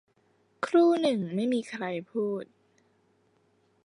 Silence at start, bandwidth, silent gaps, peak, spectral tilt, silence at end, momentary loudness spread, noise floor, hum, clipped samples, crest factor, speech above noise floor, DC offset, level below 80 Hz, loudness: 0.6 s; 10.5 kHz; none; -12 dBFS; -6.5 dB/octave; 1.4 s; 14 LU; -68 dBFS; none; under 0.1%; 18 dB; 42 dB; under 0.1%; -82 dBFS; -28 LUFS